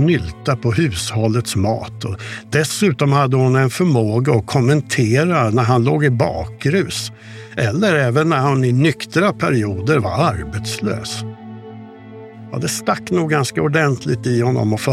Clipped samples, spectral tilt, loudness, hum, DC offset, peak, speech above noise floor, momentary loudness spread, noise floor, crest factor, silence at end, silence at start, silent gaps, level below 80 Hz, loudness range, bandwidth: under 0.1%; -6 dB/octave; -17 LUFS; none; under 0.1%; -2 dBFS; 20 dB; 13 LU; -36 dBFS; 16 dB; 0 s; 0 s; none; -44 dBFS; 6 LU; 15 kHz